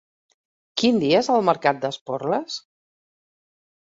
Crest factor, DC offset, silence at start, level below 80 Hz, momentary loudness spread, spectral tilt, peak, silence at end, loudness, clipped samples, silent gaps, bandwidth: 20 dB; under 0.1%; 0.75 s; -66 dBFS; 12 LU; -5 dB/octave; -4 dBFS; 1.25 s; -21 LUFS; under 0.1%; 2.01-2.06 s; 7.8 kHz